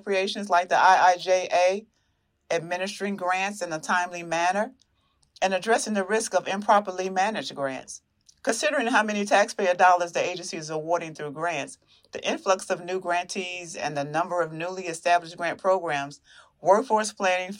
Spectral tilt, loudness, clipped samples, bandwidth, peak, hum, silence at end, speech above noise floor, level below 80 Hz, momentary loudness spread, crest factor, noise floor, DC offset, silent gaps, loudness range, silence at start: -3 dB/octave; -25 LUFS; under 0.1%; 15.5 kHz; -6 dBFS; none; 0 s; 47 dB; -74 dBFS; 11 LU; 20 dB; -72 dBFS; under 0.1%; none; 5 LU; 0.05 s